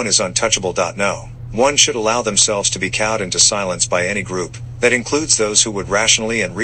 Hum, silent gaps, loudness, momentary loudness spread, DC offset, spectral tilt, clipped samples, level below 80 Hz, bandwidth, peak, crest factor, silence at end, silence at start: none; none; -15 LUFS; 8 LU; under 0.1%; -1.5 dB/octave; under 0.1%; -42 dBFS; 10.5 kHz; 0 dBFS; 18 dB; 0 s; 0 s